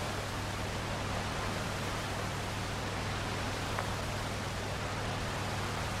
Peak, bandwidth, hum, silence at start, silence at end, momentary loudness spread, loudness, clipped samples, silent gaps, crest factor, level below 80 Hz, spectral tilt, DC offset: -18 dBFS; 16 kHz; none; 0 s; 0 s; 1 LU; -36 LUFS; under 0.1%; none; 16 dB; -46 dBFS; -4 dB/octave; under 0.1%